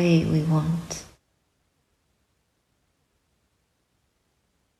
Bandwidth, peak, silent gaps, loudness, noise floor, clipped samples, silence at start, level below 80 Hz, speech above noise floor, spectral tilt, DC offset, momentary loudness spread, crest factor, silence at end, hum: 12 kHz; -10 dBFS; none; -24 LUFS; -72 dBFS; under 0.1%; 0 s; -54 dBFS; 49 dB; -7 dB/octave; under 0.1%; 15 LU; 20 dB; 3.75 s; none